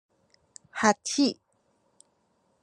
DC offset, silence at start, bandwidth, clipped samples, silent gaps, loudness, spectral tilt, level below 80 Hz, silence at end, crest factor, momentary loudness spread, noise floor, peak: under 0.1%; 0.75 s; 10.5 kHz; under 0.1%; none; -26 LUFS; -3 dB/octave; -80 dBFS; 1.3 s; 26 dB; 17 LU; -71 dBFS; -6 dBFS